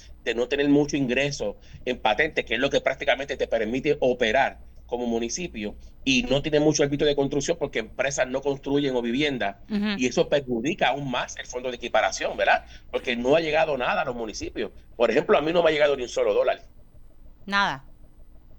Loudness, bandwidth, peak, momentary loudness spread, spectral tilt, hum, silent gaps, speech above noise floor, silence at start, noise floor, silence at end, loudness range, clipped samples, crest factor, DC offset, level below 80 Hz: -24 LUFS; 19 kHz; -8 dBFS; 11 LU; -4 dB/octave; none; none; 22 dB; 0 s; -46 dBFS; 0.05 s; 2 LU; under 0.1%; 18 dB; under 0.1%; -46 dBFS